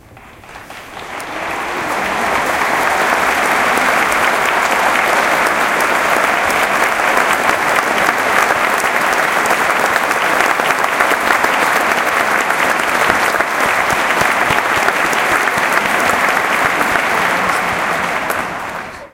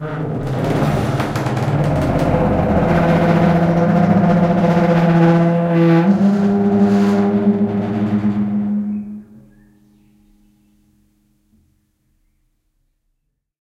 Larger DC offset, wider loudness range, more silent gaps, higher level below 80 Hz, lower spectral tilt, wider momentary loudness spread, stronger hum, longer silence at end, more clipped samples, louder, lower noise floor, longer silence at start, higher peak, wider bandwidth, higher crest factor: neither; second, 2 LU vs 10 LU; neither; second, -46 dBFS vs -36 dBFS; second, -2 dB/octave vs -8.5 dB/octave; about the same, 6 LU vs 8 LU; neither; second, 0.05 s vs 4.4 s; neither; about the same, -13 LUFS vs -15 LUFS; second, -38 dBFS vs -70 dBFS; about the same, 0.1 s vs 0 s; about the same, 0 dBFS vs 0 dBFS; first, 17.5 kHz vs 10.5 kHz; about the same, 14 dB vs 16 dB